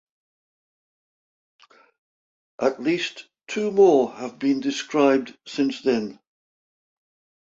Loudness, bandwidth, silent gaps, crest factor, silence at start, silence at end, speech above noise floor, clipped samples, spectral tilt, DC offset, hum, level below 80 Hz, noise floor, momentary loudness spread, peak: -22 LUFS; 7.8 kHz; none; 20 dB; 2.6 s; 1.3 s; over 68 dB; under 0.1%; -5 dB/octave; under 0.1%; none; -70 dBFS; under -90 dBFS; 14 LU; -6 dBFS